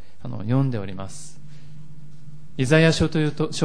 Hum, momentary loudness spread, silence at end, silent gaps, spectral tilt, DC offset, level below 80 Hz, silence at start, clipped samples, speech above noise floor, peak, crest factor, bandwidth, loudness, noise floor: none; 21 LU; 0 s; none; -6 dB/octave; 3%; -46 dBFS; 0.25 s; under 0.1%; 23 dB; -4 dBFS; 20 dB; 10.5 kHz; -21 LUFS; -45 dBFS